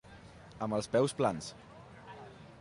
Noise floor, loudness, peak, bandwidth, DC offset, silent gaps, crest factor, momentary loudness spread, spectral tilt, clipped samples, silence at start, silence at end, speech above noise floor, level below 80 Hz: -53 dBFS; -33 LUFS; -16 dBFS; 11.5 kHz; under 0.1%; none; 20 dB; 23 LU; -5.5 dB/octave; under 0.1%; 0.05 s; 0 s; 21 dB; -64 dBFS